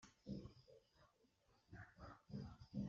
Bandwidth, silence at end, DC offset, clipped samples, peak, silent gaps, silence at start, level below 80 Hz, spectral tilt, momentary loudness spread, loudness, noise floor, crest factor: 7.4 kHz; 0 s; under 0.1%; under 0.1%; -36 dBFS; none; 0 s; -70 dBFS; -7.5 dB/octave; 9 LU; -57 LUFS; -79 dBFS; 20 dB